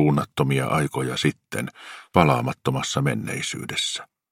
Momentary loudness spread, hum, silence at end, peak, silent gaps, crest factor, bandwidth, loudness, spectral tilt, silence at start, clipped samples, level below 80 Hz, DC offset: 11 LU; none; 0.25 s; 0 dBFS; none; 24 dB; 16 kHz; -24 LUFS; -5 dB/octave; 0 s; under 0.1%; -52 dBFS; under 0.1%